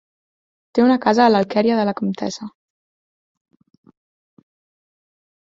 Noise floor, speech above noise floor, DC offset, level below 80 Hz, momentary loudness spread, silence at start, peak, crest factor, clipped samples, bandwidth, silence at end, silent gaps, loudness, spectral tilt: under -90 dBFS; over 73 dB; under 0.1%; -64 dBFS; 13 LU; 0.75 s; -2 dBFS; 20 dB; under 0.1%; 7.6 kHz; 3.1 s; none; -18 LUFS; -6 dB/octave